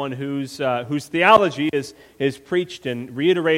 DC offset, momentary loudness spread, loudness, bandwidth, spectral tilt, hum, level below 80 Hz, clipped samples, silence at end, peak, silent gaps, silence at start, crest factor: under 0.1%; 13 LU; -21 LUFS; 15.5 kHz; -5.5 dB/octave; none; -60 dBFS; under 0.1%; 0 s; 0 dBFS; none; 0 s; 20 dB